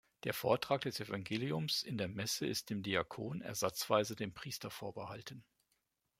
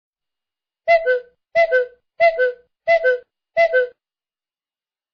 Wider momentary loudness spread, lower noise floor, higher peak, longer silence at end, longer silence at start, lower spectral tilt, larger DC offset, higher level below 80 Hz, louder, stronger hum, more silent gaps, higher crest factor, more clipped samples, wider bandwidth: about the same, 11 LU vs 10 LU; second, -83 dBFS vs under -90 dBFS; second, -16 dBFS vs -4 dBFS; second, 0.8 s vs 1.25 s; second, 0.25 s vs 0.85 s; first, -4 dB/octave vs -2 dB/octave; neither; second, -74 dBFS vs -60 dBFS; second, -38 LUFS vs -19 LUFS; neither; neither; first, 24 dB vs 16 dB; neither; first, 16 kHz vs 6.4 kHz